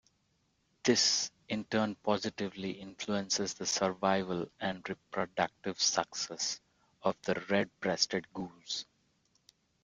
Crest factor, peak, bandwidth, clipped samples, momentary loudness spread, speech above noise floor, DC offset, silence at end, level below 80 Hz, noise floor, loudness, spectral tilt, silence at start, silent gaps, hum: 24 dB; -12 dBFS; 11 kHz; under 0.1%; 10 LU; 42 dB; under 0.1%; 1 s; -72 dBFS; -75 dBFS; -33 LUFS; -2.5 dB/octave; 0.85 s; none; none